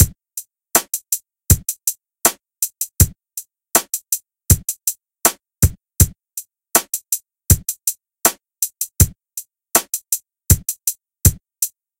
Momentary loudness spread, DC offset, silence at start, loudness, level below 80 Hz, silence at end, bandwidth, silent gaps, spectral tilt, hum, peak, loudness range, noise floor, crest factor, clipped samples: 12 LU; under 0.1%; 0 s; -18 LUFS; -30 dBFS; 0.3 s; 18 kHz; none; -3.5 dB/octave; none; 0 dBFS; 0 LU; -37 dBFS; 20 dB; under 0.1%